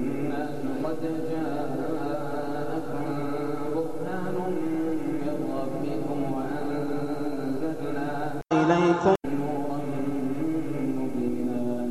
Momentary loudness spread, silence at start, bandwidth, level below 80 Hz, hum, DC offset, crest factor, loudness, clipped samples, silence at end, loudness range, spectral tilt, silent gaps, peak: 7 LU; 0 s; 13.5 kHz; -58 dBFS; none; 2%; 20 dB; -29 LUFS; under 0.1%; 0 s; 4 LU; -7.5 dB/octave; none; -8 dBFS